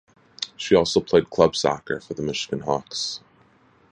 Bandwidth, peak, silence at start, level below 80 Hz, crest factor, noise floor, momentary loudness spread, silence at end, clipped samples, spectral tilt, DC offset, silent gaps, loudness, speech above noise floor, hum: 10.5 kHz; -2 dBFS; 0.4 s; -52 dBFS; 22 dB; -57 dBFS; 12 LU; 0.75 s; under 0.1%; -4.5 dB/octave; under 0.1%; none; -23 LUFS; 35 dB; none